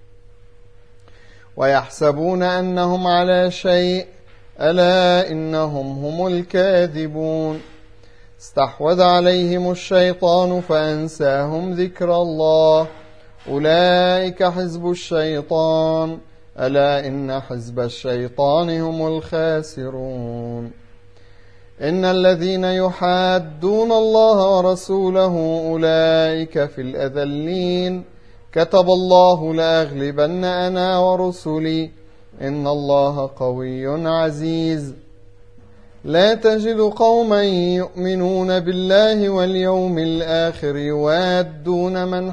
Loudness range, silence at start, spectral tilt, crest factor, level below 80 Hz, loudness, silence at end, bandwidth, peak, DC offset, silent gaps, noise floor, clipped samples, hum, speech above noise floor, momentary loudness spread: 5 LU; 1.55 s; -6.5 dB/octave; 18 dB; -48 dBFS; -18 LUFS; 0 s; 10.5 kHz; 0 dBFS; 0.6%; none; -47 dBFS; under 0.1%; none; 30 dB; 11 LU